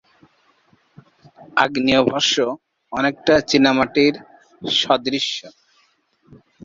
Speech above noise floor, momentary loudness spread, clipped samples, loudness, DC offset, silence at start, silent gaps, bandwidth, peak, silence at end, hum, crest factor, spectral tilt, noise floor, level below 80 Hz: 43 dB; 14 LU; under 0.1%; -18 LUFS; under 0.1%; 1.55 s; none; 7.8 kHz; -2 dBFS; 1.15 s; none; 20 dB; -3.5 dB/octave; -61 dBFS; -54 dBFS